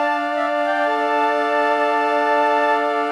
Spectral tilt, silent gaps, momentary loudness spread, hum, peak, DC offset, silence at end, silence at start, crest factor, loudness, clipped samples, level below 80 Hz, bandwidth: -2 dB/octave; none; 3 LU; none; -6 dBFS; under 0.1%; 0 s; 0 s; 12 dB; -18 LUFS; under 0.1%; -70 dBFS; 12.5 kHz